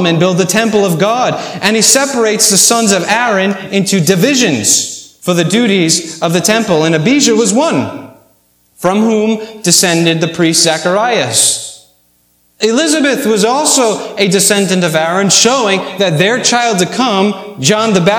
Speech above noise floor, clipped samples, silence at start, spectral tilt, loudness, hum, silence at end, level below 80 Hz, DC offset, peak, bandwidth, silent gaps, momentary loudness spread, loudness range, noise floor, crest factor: 43 dB; 0.2%; 0 s; -3 dB/octave; -10 LUFS; none; 0 s; -56 dBFS; under 0.1%; 0 dBFS; over 20 kHz; none; 7 LU; 3 LU; -54 dBFS; 12 dB